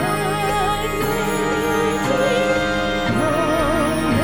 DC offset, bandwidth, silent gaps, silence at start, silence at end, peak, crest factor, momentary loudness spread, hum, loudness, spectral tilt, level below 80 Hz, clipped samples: under 0.1%; over 20 kHz; none; 0 s; 0 s; -6 dBFS; 12 dB; 2 LU; none; -19 LUFS; -5 dB/octave; -34 dBFS; under 0.1%